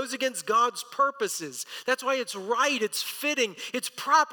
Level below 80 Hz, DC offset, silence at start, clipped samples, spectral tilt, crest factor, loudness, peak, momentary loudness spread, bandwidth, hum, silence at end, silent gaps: -86 dBFS; under 0.1%; 0 s; under 0.1%; -1 dB/octave; 18 dB; -27 LUFS; -10 dBFS; 8 LU; 19 kHz; none; 0 s; none